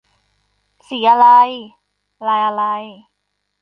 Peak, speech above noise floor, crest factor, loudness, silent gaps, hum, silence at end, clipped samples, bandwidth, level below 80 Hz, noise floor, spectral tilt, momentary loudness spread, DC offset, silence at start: -2 dBFS; 59 dB; 16 dB; -14 LUFS; none; 50 Hz at -70 dBFS; 0.7 s; under 0.1%; 5.6 kHz; -70 dBFS; -72 dBFS; -5 dB/octave; 20 LU; under 0.1%; 0.9 s